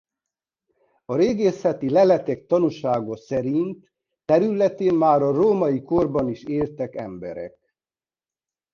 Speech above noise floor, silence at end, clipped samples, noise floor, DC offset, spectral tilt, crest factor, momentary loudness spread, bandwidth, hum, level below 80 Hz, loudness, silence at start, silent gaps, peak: over 69 dB; 1.25 s; under 0.1%; under -90 dBFS; under 0.1%; -8 dB/octave; 18 dB; 15 LU; 7 kHz; none; -56 dBFS; -21 LUFS; 1.1 s; none; -4 dBFS